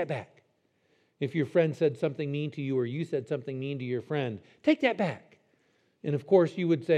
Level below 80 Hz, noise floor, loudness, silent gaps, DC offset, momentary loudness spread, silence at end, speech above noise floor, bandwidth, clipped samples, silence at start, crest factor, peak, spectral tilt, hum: -84 dBFS; -71 dBFS; -30 LUFS; none; under 0.1%; 10 LU; 0 s; 43 dB; 9.8 kHz; under 0.1%; 0 s; 20 dB; -10 dBFS; -8 dB/octave; none